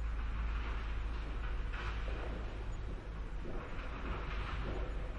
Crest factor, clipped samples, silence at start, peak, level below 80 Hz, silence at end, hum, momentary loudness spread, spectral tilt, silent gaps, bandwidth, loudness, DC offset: 10 dB; under 0.1%; 0 s; -28 dBFS; -40 dBFS; 0 s; none; 5 LU; -6.5 dB/octave; none; 7.4 kHz; -43 LUFS; under 0.1%